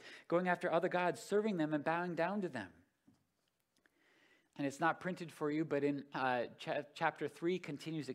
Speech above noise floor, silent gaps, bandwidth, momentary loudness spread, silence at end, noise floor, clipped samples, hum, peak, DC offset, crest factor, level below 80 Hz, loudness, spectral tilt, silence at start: 46 dB; none; 15 kHz; 8 LU; 0 s; -83 dBFS; under 0.1%; none; -20 dBFS; under 0.1%; 20 dB; -86 dBFS; -38 LUFS; -6 dB/octave; 0 s